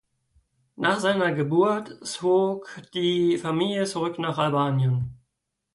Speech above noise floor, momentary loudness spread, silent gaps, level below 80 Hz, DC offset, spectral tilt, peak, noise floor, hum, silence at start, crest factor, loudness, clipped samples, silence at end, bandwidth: 56 dB; 7 LU; none; -60 dBFS; under 0.1%; -6 dB/octave; -10 dBFS; -80 dBFS; none; 0.8 s; 16 dB; -24 LUFS; under 0.1%; 0.6 s; 11.5 kHz